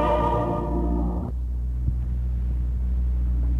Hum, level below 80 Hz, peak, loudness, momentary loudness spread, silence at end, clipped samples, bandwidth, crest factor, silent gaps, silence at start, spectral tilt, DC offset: none; -26 dBFS; -10 dBFS; -26 LUFS; 6 LU; 0 s; under 0.1%; 3.7 kHz; 12 dB; none; 0 s; -9.5 dB/octave; under 0.1%